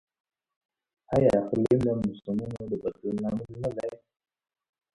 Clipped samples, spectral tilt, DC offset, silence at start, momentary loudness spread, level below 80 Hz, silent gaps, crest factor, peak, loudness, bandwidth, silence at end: under 0.1%; -9 dB/octave; under 0.1%; 1.1 s; 10 LU; -54 dBFS; none; 20 dB; -10 dBFS; -28 LUFS; 11.5 kHz; 1 s